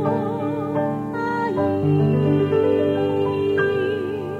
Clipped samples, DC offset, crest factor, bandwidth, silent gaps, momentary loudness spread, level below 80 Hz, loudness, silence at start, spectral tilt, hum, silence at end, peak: under 0.1%; under 0.1%; 12 dB; 7.2 kHz; none; 6 LU; -56 dBFS; -21 LUFS; 0 s; -9 dB/octave; none; 0 s; -8 dBFS